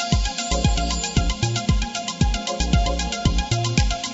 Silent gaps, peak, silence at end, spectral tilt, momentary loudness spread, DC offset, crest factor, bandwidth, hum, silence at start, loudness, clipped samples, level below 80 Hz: none; -4 dBFS; 0 s; -4.5 dB/octave; 2 LU; under 0.1%; 16 dB; 8 kHz; none; 0 s; -22 LUFS; under 0.1%; -24 dBFS